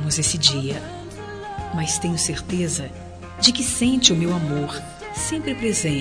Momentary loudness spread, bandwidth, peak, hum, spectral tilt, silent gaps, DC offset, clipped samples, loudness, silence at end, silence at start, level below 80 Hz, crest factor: 18 LU; 14 kHz; 0 dBFS; none; -3 dB/octave; none; under 0.1%; under 0.1%; -20 LUFS; 0 s; 0 s; -44 dBFS; 22 dB